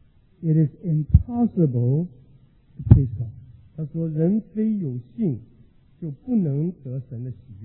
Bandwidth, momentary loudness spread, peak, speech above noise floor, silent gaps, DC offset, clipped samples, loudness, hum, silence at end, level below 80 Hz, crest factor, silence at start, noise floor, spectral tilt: 2.6 kHz; 17 LU; 0 dBFS; 32 dB; none; under 0.1%; under 0.1%; -23 LUFS; none; 0 s; -34 dBFS; 22 dB; 0.4 s; -53 dBFS; -15 dB/octave